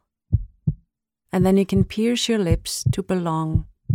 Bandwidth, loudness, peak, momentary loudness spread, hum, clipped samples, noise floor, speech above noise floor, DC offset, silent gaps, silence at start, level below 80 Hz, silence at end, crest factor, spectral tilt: 16.5 kHz; -22 LUFS; -6 dBFS; 9 LU; none; under 0.1%; -71 dBFS; 51 dB; under 0.1%; none; 0.3 s; -34 dBFS; 0 s; 16 dB; -6 dB/octave